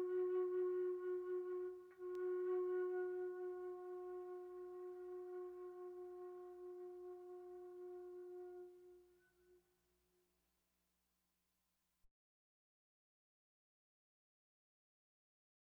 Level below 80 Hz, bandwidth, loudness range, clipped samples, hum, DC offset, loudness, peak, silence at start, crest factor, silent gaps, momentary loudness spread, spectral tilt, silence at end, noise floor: -90 dBFS; 3.1 kHz; 15 LU; under 0.1%; none; under 0.1%; -47 LUFS; -34 dBFS; 0 s; 14 dB; none; 14 LU; -6.5 dB/octave; 3.6 s; -87 dBFS